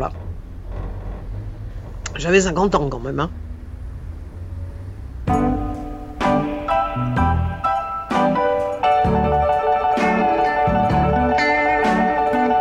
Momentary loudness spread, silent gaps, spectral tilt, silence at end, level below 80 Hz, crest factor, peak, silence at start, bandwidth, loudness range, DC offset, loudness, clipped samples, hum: 17 LU; none; -6 dB/octave; 0 s; -32 dBFS; 16 dB; -4 dBFS; 0 s; 11.5 kHz; 7 LU; under 0.1%; -19 LUFS; under 0.1%; none